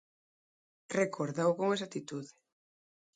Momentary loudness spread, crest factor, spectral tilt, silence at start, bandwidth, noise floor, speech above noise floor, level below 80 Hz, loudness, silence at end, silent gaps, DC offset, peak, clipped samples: 14 LU; 20 dB; -5.5 dB/octave; 0.9 s; 9.4 kHz; under -90 dBFS; over 57 dB; -80 dBFS; -34 LUFS; 0.85 s; none; under 0.1%; -16 dBFS; under 0.1%